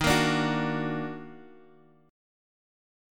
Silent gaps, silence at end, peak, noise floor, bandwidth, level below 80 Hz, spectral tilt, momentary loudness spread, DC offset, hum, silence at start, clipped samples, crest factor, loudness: none; 1.7 s; -10 dBFS; -57 dBFS; 17.5 kHz; -50 dBFS; -4.5 dB/octave; 18 LU; under 0.1%; none; 0 s; under 0.1%; 22 dB; -28 LUFS